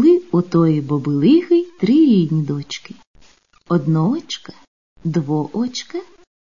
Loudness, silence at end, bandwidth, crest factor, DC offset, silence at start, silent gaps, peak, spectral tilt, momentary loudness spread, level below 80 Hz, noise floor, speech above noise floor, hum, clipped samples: -17 LUFS; 0.45 s; 7.4 kHz; 14 dB; 0.4%; 0 s; 3.07-3.14 s, 4.68-4.96 s; -4 dBFS; -7.5 dB/octave; 16 LU; -58 dBFS; -51 dBFS; 35 dB; none; under 0.1%